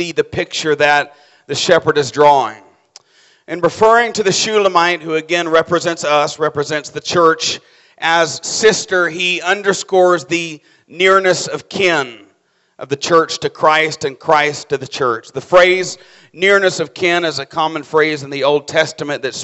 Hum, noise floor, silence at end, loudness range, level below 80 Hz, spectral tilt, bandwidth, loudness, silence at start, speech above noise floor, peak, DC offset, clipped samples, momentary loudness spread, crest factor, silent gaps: none; -59 dBFS; 0 s; 2 LU; -56 dBFS; -3 dB/octave; 8.4 kHz; -14 LUFS; 0 s; 44 dB; 0 dBFS; under 0.1%; under 0.1%; 10 LU; 14 dB; none